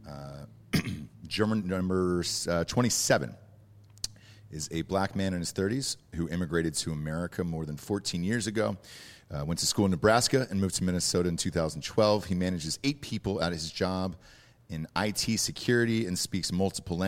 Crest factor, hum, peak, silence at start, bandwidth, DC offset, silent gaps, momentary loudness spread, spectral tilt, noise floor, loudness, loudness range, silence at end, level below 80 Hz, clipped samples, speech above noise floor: 20 dB; none; -10 dBFS; 0 s; 16.5 kHz; under 0.1%; none; 13 LU; -4.5 dB/octave; -55 dBFS; -29 LUFS; 5 LU; 0 s; -52 dBFS; under 0.1%; 25 dB